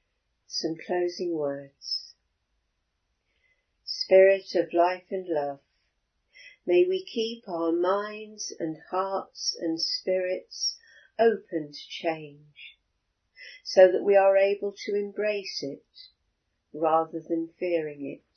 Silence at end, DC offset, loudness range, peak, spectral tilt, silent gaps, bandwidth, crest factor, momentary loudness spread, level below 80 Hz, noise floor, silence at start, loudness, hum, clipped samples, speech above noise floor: 0.2 s; under 0.1%; 7 LU; -4 dBFS; -3.5 dB/octave; none; 6.6 kHz; 22 dB; 18 LU; -80 dBFS; -77 dBFS; 0.5 s; -26 LUFS; none; under 0.1%; 51 dB